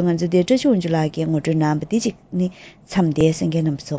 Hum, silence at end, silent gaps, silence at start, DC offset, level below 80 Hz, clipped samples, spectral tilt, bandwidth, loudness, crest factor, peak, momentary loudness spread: none; 0 s; none; 0 s; under 0.1%; -50 dBFS; under 0.1%; -7 dB/octave; 8 kHz; -20 LUFS; 14 dB; -4 dBFS; 7 LU